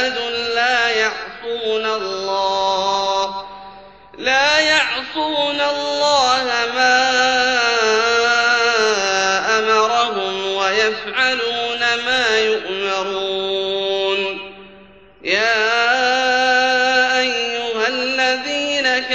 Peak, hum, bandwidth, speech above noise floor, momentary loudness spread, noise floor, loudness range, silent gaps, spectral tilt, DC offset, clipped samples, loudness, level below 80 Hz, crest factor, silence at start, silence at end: -2 dBFS; none; 8.4 kHz; 27 dB; 7 LU; -45 dBFS; 5 LU; none; -1 dB/octave; 0.2%; under 0.1%; -16 LUFS; -54 dBFS; 16 dB; 0 s; 0 s